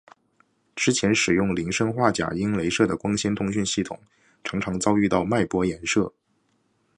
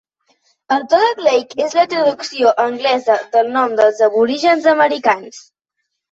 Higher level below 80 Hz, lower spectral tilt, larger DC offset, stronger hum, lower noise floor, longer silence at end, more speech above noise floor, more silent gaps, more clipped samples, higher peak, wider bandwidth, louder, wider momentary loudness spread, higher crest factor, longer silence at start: first, -50 dBFS vs -64 dBFS; first, -4.5 dB/octave vs -3 dB/octave; neither; neither; second, -68 dBFS vs -74 dBFS; first, 0.9 s vs 0.7 s; second, 45 dB vs 60 dB; neither; neither; about the same, -4 dBFS vs -2 dBFS; first, 11 kHz vs 8 kHz; second, -24 LUFS vs -15 LUFS; first, 10 LU vs 5 LU; first, 22 dB vs 14 dB; about the same, 0.75 s vs 0.7 s